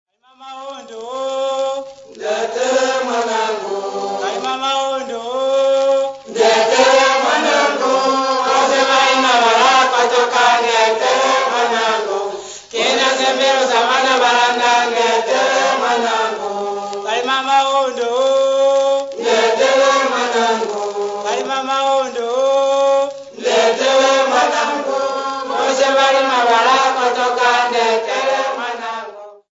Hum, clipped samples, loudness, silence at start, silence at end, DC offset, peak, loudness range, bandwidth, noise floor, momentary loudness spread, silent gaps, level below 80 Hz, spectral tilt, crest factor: none; under 0.1%; -15 LUFS; 0.4 s; 0.2 s; under 0.1%; 0 dBFS; 6 LU; 8 kHz; -38 dBFS; 10 LU; none; -64 dBFS; -1 dB/octave; 16 dB